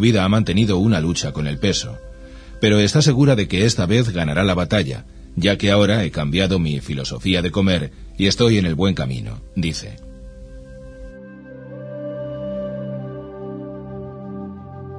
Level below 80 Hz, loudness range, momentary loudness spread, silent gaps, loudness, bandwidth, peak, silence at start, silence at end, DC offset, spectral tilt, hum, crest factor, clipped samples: -38 dBFS; 13 LU; 23 LU; none; -19 LUFS; 10.5 kHz; 0 dBFS; 0 s; 0 s; under 0.1%; -5.5 dB/octave; none; 18 dB; under 0.1%